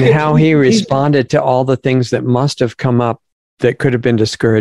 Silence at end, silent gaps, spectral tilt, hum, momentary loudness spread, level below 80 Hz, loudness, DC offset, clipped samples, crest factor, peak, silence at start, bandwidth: 0 s; 3.32-3.57 s; -6.5 dB/octave; none; 6 LU; -48 dBFS; -13 LUFS; 0.3%; under 0.1%; 12 dB; 0 dBFS; 0 s; 11.5 kHz